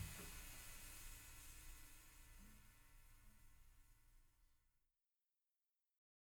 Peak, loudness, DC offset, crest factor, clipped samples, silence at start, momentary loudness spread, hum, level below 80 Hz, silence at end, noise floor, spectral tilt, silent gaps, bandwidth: -40 dBFS; -59 LUFS; under 0.1%; 22 dB; under 0.1%; 0 s; 11 LU; none; -64 dBFS; 1.6 s; under -90 dBFS; -2.5 dB/octave; none; over 20 kHz